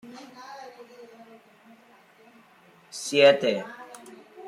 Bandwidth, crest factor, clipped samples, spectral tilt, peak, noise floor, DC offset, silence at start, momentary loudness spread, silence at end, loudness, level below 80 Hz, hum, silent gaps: 13 kHz; 24 dB; under 0.1%; -3 dB/octave; -4 dBFS; -56 dBFS; under 0.1%; 0.05 s; 28 LU; 0 s; -22 LUFS; -80 dBFS; none; none